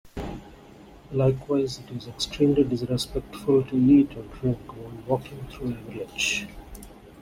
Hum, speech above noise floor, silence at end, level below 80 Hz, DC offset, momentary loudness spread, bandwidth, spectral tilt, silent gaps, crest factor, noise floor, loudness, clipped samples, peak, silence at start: none; 23 dB; 0 s; -46 dBFS; under 0.1%; 19 LU; 16 kHz; -6 dB/octave; none; 18 dB; -48 dBFS; -25 LUFS; under 0.1%; -8 dBFS; 0.05 s